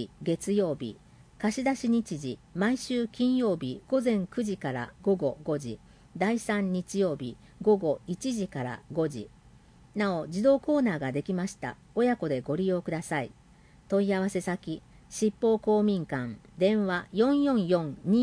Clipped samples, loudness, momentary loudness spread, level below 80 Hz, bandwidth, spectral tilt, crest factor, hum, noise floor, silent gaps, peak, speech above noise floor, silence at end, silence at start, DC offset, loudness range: under 0.1%; -29 LUFS; 11 LU; -60 dBFS; 10.5 kHz; -6 dB/octave; 16 dB; none; -56 dBFS; none; -12 dBFS; 28 dB; 0 s; 0 s; under 0.1%; 3 LU